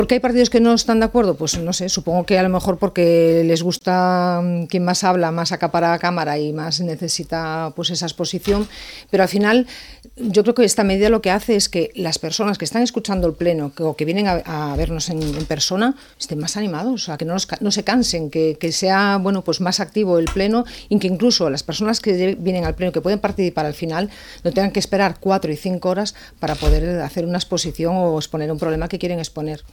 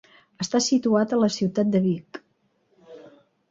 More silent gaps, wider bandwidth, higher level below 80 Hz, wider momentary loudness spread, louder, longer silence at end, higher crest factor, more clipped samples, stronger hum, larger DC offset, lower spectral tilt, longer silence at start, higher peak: neither; first, 18 kHz vs 8 kHz; first, -34 dBFS vs -66 dBFS; second, 8 LU vs 12 LU; first, -19 LUFS vs -23 LUFS; second, 0.05 s vs 0.55 s; about the same, 18 dB vs 16 dB; neither; neither; neither; about the same, -4.5 dB/octave vs -5 dB/octave; second, 0 s vs 0.4 s; first, -2 dBFS vs -10 dBFS